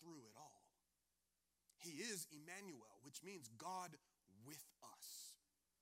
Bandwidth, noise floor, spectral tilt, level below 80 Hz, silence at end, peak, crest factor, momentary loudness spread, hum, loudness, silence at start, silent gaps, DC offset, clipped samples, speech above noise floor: 16 kHz; -90 dBFS; -2.5 dB/octave; under -90 dBFS; 0.45 s; -36 dBFS; 22 dB; 16 LU; none; -55 LUFS; 0 s; none; under 0.1%; under 0.1%; 33 dB